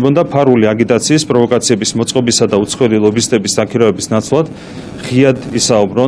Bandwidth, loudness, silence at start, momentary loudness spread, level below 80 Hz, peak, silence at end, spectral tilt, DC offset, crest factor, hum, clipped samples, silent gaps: 11 kHz; -12 LUFS; 0 s; 5 LU; -46 dBFS; 0 dBFS; 0 s; -4.5 dB/octave; under 0.1%; 12 dB; none; 0.7%; none